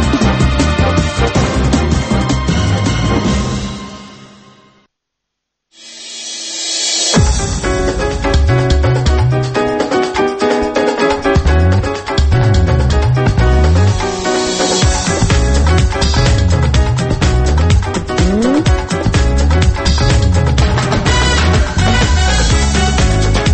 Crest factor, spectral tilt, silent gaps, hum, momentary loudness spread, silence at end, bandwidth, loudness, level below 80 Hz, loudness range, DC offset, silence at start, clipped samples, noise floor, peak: 12 dB; -5 dB/octave; none; none; 4 LU; 0 s; 8.8 kHz; -13 LUFS; -16 dBFS; 5 LU; under 0.1%; 0 s; under 0.1%; -76 dBFS; 0 dBFS